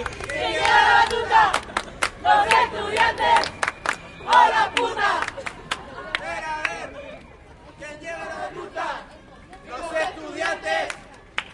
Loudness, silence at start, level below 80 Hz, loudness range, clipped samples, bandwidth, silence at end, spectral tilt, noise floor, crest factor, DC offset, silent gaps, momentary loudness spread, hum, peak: -21 LUFS; 0 s; -48 dBFS; 13 LU; under 0.1%; 11.5 kHz; 0 s; -2 dB/octave; -45 dBFS; 20 dB; under 0.1%; none; 17 LU; none; -2 dBFS